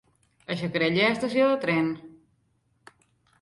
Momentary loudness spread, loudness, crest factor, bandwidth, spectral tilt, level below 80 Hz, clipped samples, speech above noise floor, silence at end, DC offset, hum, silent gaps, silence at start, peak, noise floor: 13 LU; -25 LUFS; 18 dB; 11.5 kHz; -6 dB/octave; -66 dBFS; under 0.1%; 45 dB; 1.3 s; under 0.1%; none; none; 0.5 s; -10 dBFS; -69 dBFS